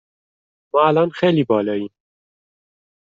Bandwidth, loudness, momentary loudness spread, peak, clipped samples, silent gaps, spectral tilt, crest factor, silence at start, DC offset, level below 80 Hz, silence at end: 7.6 kHz; -18 LUFS; 10 LU; -4 dBFS; under 0.1%; none; -5.5 dB/octave; 18 dB; 0.75 s; under 0.1%; -64 dBFS; 1.15 s